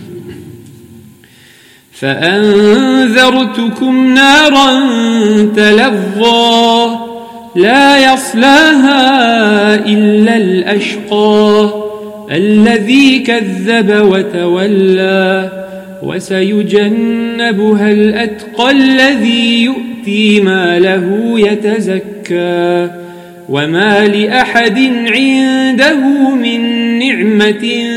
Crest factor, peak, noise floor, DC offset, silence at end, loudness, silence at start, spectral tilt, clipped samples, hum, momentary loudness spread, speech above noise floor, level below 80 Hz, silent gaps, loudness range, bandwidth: 10 dB; 0 dBFS; -41 dBFS; under 0.1%; 0 s; -9 LUFS; 0 s; -5 dB/octave; 0.3%; none; 10 LU; 33 dB; -50 dBFS; none; 5 LU; 15 kHz